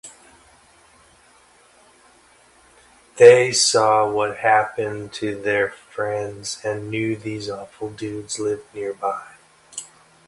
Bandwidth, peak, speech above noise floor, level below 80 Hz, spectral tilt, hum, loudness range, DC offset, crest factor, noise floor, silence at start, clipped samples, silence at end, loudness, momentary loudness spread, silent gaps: 11.5 kHz; 0 dBFS; 34 dB; -60 dBFS; -3 dB/octave; none; 10 LU; under 0.1%; 22 dB; -53 dBFS; 0.05 s; under 0.1%; 0.45 s; -20 LUFS; 19 LU; none